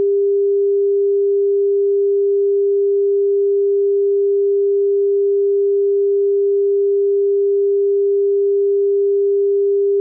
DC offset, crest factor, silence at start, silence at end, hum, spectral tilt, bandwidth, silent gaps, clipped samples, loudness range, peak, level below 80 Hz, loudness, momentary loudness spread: under 0.1%; 4 dB; 0 s; 0 s; none; -13.5 dB/octave; 0.5 kHz; none; under 0.1%; 0 LU; -12 dBFS; under -90 dBFS; -16 LUFS; 0 LU